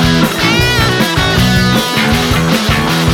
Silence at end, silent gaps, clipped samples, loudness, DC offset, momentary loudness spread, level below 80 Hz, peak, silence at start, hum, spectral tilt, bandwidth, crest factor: 0 s; none; under 0.1%; -11 LUFS; under 0.1%; 2 LU; -24 dBFS; 0 dBFS; 0 s; none; -4.5 dB/octave; 18.5 kHz; 10 dB